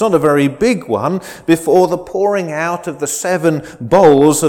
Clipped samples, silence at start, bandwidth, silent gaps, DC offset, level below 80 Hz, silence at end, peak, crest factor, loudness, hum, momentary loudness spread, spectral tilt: under 0.1%; 0 s; 18 kHz; none; under 0.1%; -48 dBFS; 0 s; 0 dBFS; 12 dB; -14 LUFS; none; 11 LU; -5.5 dB/octave